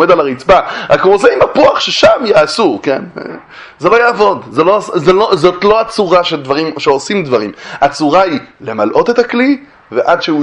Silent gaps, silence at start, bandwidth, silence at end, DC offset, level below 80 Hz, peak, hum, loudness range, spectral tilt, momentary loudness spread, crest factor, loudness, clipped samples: none; 0 s; 11 kHz; 0 s; under 0.1%; -44 dBFS; 0 dBFS; none; 3 LU; -5 dB/octave; 8 LU; 10 dB; -10 LUFS; 0.5%